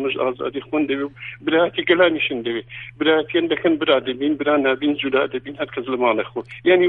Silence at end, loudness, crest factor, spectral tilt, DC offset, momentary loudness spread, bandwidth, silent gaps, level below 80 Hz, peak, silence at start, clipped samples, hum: 0 s; -20 LUFS; 16 dB; -8 dB/octave; under 0.1%; 10 LU; 4.1 kHz; none; -58 dBFS; -2 dBFS; 0 s; under 0.1%; none